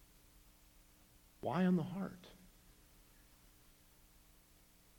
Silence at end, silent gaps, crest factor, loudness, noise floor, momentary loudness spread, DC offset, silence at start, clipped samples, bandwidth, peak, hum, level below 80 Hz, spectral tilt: 2.65 s; none; 22 dB; -38 LUFS; -67 dBFS; 28 LU; under 0.1%; 1.45 s; under 0.1%; 19 kHz; -22 dBFS; 60 Hz at -60 dBFS; -68 dBFS; -7.5 dB/octave